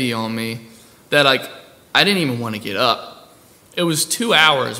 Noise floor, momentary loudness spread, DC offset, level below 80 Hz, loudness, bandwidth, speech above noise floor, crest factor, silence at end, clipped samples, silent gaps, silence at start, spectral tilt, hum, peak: -48 dBFS; 15 LU; under 0.1%; -64 dBFS; -17 LUFS; over 20 kHz; 30 dB; 20 dB; 0 s; under 0.1%; none; 0 s; -3 dB/octave; none; 0 dBFS